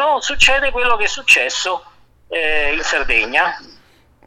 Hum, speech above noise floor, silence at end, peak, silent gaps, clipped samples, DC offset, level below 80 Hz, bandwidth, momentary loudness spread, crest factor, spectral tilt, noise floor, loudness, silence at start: none; 34 dB; 0.6 s; 0 dBFS; none; under 0.1%; under 0.1%; -34 dBFS; 14.5 kHz; 10 LU; 16 dB; -0.5 dB/octave; -50 dBFS; -15 LUFS; 0 s